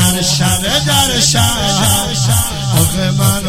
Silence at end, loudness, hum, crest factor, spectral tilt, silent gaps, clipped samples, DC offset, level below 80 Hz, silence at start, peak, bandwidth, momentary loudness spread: 0 s; -12 LUFS; none; 12 dB; -3.5 dB/octave; none; under 0.1%; under 0.1%; -30 dBFS; 0 s; 0 dBFS; 17 kHz; 3 LU